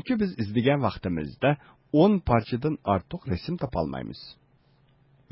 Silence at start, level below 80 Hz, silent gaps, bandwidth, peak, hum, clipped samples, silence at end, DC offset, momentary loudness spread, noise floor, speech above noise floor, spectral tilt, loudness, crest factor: 0.05 s; -46 dBFS; none; 5.8 kHz; -8 dBFS; none; under 0.1%; 1 s; under 0.1%; 12 LU; -62 dBFS; 36 dB; -11.5 dB/octave; -26 LUFS; 18 dB